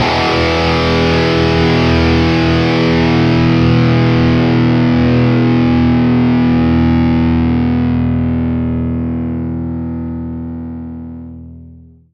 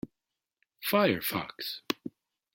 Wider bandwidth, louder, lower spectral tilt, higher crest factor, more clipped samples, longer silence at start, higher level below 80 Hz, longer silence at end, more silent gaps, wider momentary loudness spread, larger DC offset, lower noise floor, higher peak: second, 7 kHz vs 17 kHz; first, -12 LUFS vs -31 LUFS; first, -7.5 dB/octave vs -4.5 dB/octave; second, 12 dB vs 24 dB; neither; about the same, 0 s vs 0.05 s; first, -30 dBFS vs -70 dBFS; about the same, 0.35 s vs 0.45 s; neither; second, 12 LU vs 15 LU; neither; second, -38 dBFS vs -88 dBFS; first, 0 dBFS vs -10 dBFS